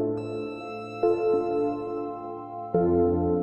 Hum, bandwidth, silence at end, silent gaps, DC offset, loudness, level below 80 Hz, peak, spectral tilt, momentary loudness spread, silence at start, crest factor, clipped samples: none; 7.8 kHz; 0 s; none; under 0.1%; -27 LUFS; -52 dBFS; -12 dBFS; -9.5 dB/octave; 13 LU; 0 s; 16 dB; under 0.1%